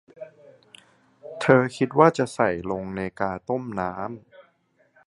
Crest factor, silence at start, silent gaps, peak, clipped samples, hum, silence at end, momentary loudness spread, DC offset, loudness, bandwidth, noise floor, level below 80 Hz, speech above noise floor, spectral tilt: 24 dB; 0.2 s; none; 0 dBFS; under 0.1%; none; 0.65 s; 24 LU; under 0.1%; -23 LUFS; 11.5 kHz; -65 dBFS; -56 dBFS; 42 dB; -6.5 dB/octave